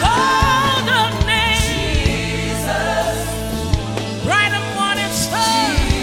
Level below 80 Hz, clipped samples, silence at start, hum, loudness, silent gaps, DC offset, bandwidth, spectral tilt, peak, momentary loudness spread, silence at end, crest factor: -26 dBFS; under 0.1%; 0 s; none; -17 LUFS; none; under 0.1%; 18 kHz; -3.5 dB/octave; -2 dBFS; 7 LU; 0 s; 16 dB